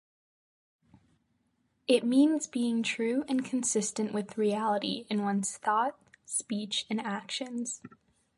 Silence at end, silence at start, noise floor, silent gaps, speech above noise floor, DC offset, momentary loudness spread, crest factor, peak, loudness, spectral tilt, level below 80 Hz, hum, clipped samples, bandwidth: 0.5 s; 1.9 s; -75 dBFS; none; 45 dB; under 0.1%; 9 LU; 20 dB; -12 dBFS; -30 LUFS; -3.5 dB/octave; -80 dBFS; none; under 0.1%; 11.5 kHz